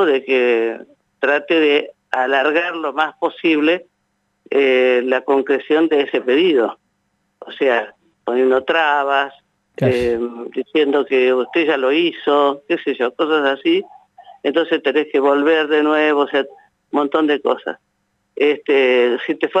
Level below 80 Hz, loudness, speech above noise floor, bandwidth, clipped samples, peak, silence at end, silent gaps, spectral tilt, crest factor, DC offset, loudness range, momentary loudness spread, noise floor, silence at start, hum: -58 dBFS; -17 LUFS; 52 dB; 8 kHz; under 0.1%; -2 dBFS; 0 s; none; -6 dB/octave; 14 dB; under 0.1%; 2 LU; 8 LU; -68 dBFS; 0 s; none